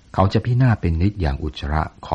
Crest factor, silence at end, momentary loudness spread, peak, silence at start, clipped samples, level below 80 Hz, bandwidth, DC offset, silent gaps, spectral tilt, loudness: 16 dB; 0 s; 7 LU; -2 dBFS; 0.15 s; under 0.1%; -30 dBFS; 7.8 kHz; under 0.1%; none; -8.5 dB/octave; -20 LUFS